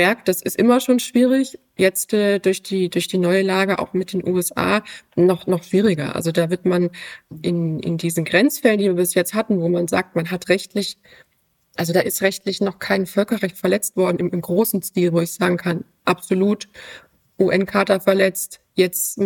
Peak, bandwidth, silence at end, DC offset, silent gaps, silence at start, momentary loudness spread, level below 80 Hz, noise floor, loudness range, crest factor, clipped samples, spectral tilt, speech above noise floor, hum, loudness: 0 dBFS; 17.5 kHz; 0 s; under 0.1%; none; 0 s; 8 LU; -60 dBFS; -61 dBFS; 3 LU; 18 dB; under 0.1%; -5 dB/octave; 42 dB; none; -19 LUFS